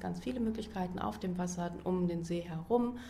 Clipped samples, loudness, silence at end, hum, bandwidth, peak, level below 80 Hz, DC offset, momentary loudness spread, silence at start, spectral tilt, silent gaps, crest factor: under 0.1%; -36 LUFS; 0 s; none; 13.5 kHz; -18 dBFS; -54 dBFS; under 0.1%; 5 LU; 0 s; -6.5 dB/octave; none; 18 dB